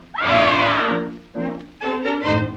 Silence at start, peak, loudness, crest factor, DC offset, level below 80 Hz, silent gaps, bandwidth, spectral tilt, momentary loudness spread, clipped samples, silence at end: 0 s; -4 dBFS; -19 LUFS; 16 dB; under 0.1%; -50 dBFS; none; 9 kHz; -6 dB/octave; 13 LU; under 0.1%; 0 s